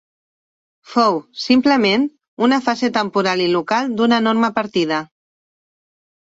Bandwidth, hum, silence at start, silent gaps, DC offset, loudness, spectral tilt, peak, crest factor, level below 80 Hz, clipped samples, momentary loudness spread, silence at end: 7.8 kHz; none; 0.9 s; 2.28-2.37 s; under 0.1%; -17 LUFS; -5 dB/octave; -2 dBFS; 16 dB; -62 dBFS; under 0.1%; 6 LU; 1.25 s